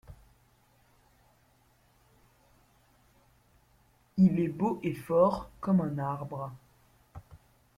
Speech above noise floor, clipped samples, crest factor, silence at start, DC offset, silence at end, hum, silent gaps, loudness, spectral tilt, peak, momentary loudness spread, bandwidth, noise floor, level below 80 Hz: 38 dB; under 0.1%; 22 dB; 0.1 s; under 0.1%; 0.4 s; none; none; -29 LUFS; -9.5 dB/octave; -12 dBFS; 27 LU; 12 kHz; -66 dBFS; -60 dBFS